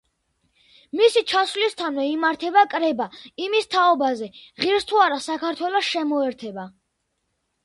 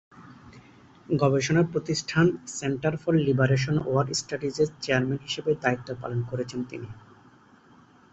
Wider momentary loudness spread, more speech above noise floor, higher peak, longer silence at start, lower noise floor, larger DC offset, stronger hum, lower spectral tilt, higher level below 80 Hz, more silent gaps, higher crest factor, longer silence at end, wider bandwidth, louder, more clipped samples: first, 13 LU vs 9 LU; first, 53 dB vs 30 dB; about the same, -4 dBFS vs -6 dBFS; first, 0.95 s vs 0.15 s; first, -75 dBFS vs -55 dBFS; neither; neither; second, -3 dB/octave vs -5.5 dB/octave; second, -68 dBFS vs -58 dBFS; neither; about the same, 18 dB vs 20 dB; second, 0.95 s vs 1.15 s; first, 11.5 kHz vs 8.2 kHz; first, -21 LUFS vs -26 LUFS; neither